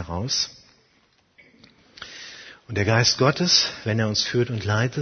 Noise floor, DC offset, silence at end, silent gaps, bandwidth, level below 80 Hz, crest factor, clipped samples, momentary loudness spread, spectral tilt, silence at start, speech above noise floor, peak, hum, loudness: -63 dBFS; under 0.1%; 0 s; none; 6.6 kHz; -54 dBFS; 20 dB; under 0.1%; 21 LU; -3.5 dB/octave; 0 s; 40 dB; -4 dBFS; none; -21 LUFS